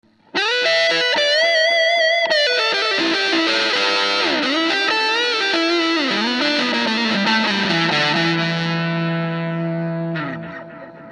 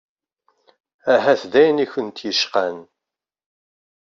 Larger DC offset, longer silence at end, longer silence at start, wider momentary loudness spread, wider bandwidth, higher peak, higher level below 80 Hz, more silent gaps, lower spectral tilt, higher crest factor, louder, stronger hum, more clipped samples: neither; second, 0 s vs 1.2 s; second, 0.35 s vs 1.05 s; second, 9 LU vs 12 LU; first, 10.5 kHz vs 7.4 kHz; about the same, -4 dBFS vs -2 dBFS; about the same, -66 dBFS vs -70 dBFS; neither; about the same, -4 dB/octave vs -3.5 dB/octave; second, 14 dB vs 20 dB; about the same, -17 LUFS vs -19 LUFS; neither; neither